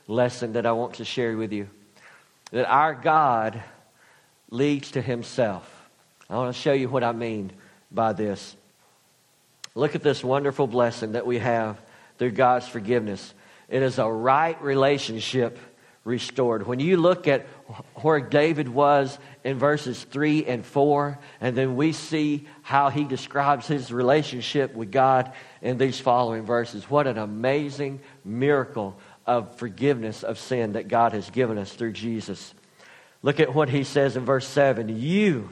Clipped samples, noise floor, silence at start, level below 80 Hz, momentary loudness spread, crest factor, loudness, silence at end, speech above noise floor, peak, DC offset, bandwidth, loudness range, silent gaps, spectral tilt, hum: under 0.1%; -62 dBFS; 0.1 s; -68 dBFS; 12 LU; 20 dB; -24 LUFS; 0 s; 38 dB; -6 dBFS; under 0.1%; 12 kHz; 5 LU; none; -6 dB/octave; none